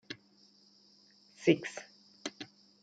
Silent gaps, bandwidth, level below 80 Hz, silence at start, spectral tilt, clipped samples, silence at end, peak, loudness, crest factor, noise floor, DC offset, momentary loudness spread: none; 9.2 kHz; -84 dBFS; 0.1 s; -5 dB/octave; under 0.1%; 0.35 s; -10 dBFS; -34 LUFS; 26 dB; -65 dBFS; under 0.1%; 20 LU